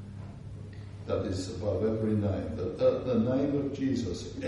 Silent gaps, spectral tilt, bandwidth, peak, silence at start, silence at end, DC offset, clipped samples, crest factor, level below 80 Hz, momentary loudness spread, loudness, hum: none; -7.5 dB/octave; 11 kHz; -14 dBFS; 0 s; 0 s; under 0.1%; under 0.1%; 16 dB; -52 dBFS; 16 LU; -30 LUFS; none